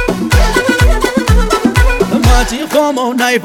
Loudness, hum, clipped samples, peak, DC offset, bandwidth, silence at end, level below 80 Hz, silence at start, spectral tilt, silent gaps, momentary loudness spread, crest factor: -11 LUFS; none; under 0.1%; 0 dBFS; under 0.1%; 17.5 kHz; 0 s; -14 dBFS; 0 s; -5 dB/octave; none; 3 LU; 10 dB